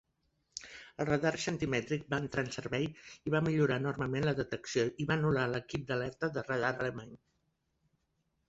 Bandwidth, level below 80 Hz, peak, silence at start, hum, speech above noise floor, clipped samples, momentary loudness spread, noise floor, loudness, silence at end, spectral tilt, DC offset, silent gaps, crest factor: 8 kHz; -62 dBFS; -16 dBFS; 0.55 s; none; 46 dB; under 0.1%; 13 LU; -80 dBFS; -34 LUFS; 1.3 s; -6 dB/octave; under 0.1%; none; 18 dB